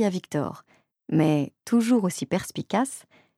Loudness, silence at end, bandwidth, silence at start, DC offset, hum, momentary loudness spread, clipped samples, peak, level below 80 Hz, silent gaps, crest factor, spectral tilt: -25 LUFS; 0.4 s; 15 kHz; 0 s; under 0.1%; none; 10 LU; under 0.1%; -10 dBFS; -64 dBFS; none; 16 dB; -6 dB/octave